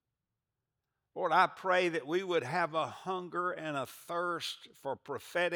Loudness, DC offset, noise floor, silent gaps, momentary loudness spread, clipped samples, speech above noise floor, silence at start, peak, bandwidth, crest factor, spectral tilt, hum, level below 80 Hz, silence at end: -34 LUFS; under 0.1%; -88 dBFS; none; 13 LU; under 0.1%; 55 dB; 1.15 s; -12 dBFS; over 20 kHz; 22 dB; -4.5 dB/octave; none; -86 dBFS; 0 s